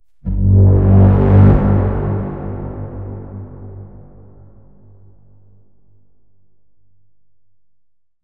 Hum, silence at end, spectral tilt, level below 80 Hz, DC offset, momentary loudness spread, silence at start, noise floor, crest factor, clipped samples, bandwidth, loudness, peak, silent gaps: none; 4.35 s; -13 dB/octave; -26 dBFS; 0.6%; 23 LU; 0.25 s; -67 dBFS; 16 dB; under 0.1%; 2.8 kHz; -13 LUFS; 0 dBFS; none